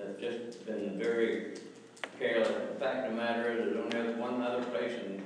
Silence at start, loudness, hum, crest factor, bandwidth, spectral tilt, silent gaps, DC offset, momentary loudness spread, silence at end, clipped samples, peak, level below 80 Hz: 0 s; -34 LUFS; none; 18 dB; 10.5 kHz; -5 dB/octave; none; under 0.1%; 11 LU; 0 s; under 0.1%; -16 dBFS; -88 dBFS